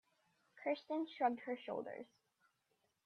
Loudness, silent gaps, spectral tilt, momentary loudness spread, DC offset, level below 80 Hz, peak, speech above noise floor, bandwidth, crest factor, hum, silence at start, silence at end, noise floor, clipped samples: -42 LUFS; none; -6 dB/octave; 13 LU; under 0.1%; under -90 dBFS; -24 dBFS; 41 dB; 6.6 kHz; 22 dB; none; 0.55 s; 1 s; -83 dBFS; under 0.1%